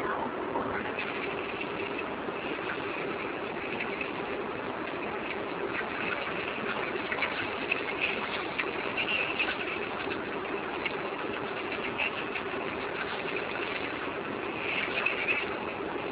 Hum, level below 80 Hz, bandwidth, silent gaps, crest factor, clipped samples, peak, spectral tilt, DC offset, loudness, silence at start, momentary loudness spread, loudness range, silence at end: none; -60 dBFS; 4 kHz; none; 20 dB; under 0.1%; -14 dBFS; -1.5 dB/octave; under 0.1%; -32 LUFS; 0 s; 6 LU; 4 LU; 0 s